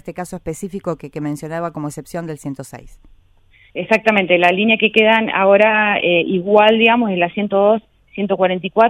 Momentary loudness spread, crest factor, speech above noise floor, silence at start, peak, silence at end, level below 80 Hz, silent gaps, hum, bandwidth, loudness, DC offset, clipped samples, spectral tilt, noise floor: 16 LU; 16 dB; 35 dB; 0.05 s; 0 dBFS; 0 s; -50 dBFS; none; none; 14.5 kHz; -15 LUFS; under 0.1%; under 0.1%; -5.5 dB/octave; -51 dBFS